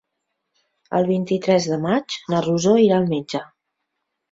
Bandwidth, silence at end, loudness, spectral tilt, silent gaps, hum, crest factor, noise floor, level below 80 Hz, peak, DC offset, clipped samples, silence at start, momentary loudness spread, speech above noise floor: 7.8 kHz; 0.85 s; -20 LUFS; -6 dB/octave; none; none; 16 dB; -78 dBFS; -60 dBFS; -4 dBFS; under 0.1%; under 0.1%; 0.9 s; 10 LU; 59 dB